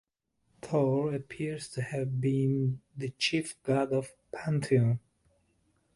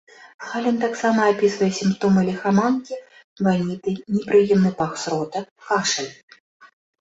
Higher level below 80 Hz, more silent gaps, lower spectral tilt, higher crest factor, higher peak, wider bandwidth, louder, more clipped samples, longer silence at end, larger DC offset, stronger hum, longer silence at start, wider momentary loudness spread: second, -66 dBFS vs -60 dBFS; second, none vs 0.34-0.39 s, 3.24-3.36 s, 5.51-5.56 s, 6.23-6.28 s, 6.40-6.60 s; about the same, -6.5 dB/octave vs -5.5 dB/octave; about the same, 18 dB vs 16 dB; second, -14 dBFS vs -4 dBFS; first, 11.5 kHz vs 8 kHz; second, -31 LUFS vs -21 LUFS; neither; first, 0.95 s vs 0.35 s; neither; neither; first, 0.65 s vs 0.2 s; about the same, 10 LU vs 12 LU